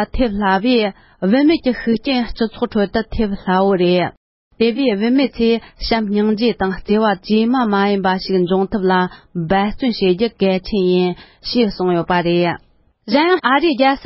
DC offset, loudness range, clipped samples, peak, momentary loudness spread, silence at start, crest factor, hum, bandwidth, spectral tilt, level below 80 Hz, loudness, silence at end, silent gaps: under 0.1%; 1 LU; under 0.1%; 0 dBFS; 7 LU; 0 s; 16 dB; none; 5.8 kHz; -10.5 dB/octave; -38 dBFS; -17 LUFS; 0 s; 4.17-4.51 s